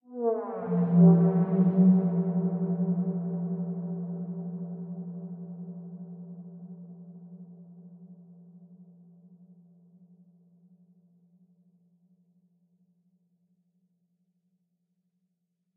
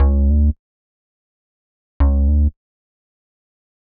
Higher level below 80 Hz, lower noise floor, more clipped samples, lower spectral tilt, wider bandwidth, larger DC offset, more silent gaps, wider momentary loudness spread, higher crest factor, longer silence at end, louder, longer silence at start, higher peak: second, -78 dBFS vs -20 dBFS; second, -80 dBFS vs under -90 dBFS; neither; first, -14 dB/octave vs -11 dB/octave; second, 2 kHz vs 2.3 kHz; neither; second, none vs 0.59-2.00 s; first, 26 LU vs 6 LU; first, 22 dB vs 16 dB; first, 6.95 s vs 1.5 s; second, -26 LUFS vs -18 LUFS; about the same, 0.1 s vs 0 s; second, -8 dBFS vs -4 dBFS